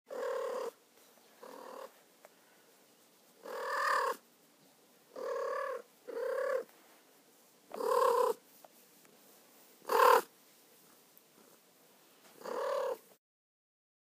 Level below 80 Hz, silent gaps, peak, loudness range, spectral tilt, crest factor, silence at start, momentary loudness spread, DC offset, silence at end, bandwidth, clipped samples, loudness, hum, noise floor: under -90 dBFS; none; -12 dBFS; 11 LU; -1 dB/octave; 26 dB; 0.1 s; 23 LU; under 0.1%; 1.2 s; 15.5 kHz; under 0.1%; -34 LUFS; none; -65 dBFS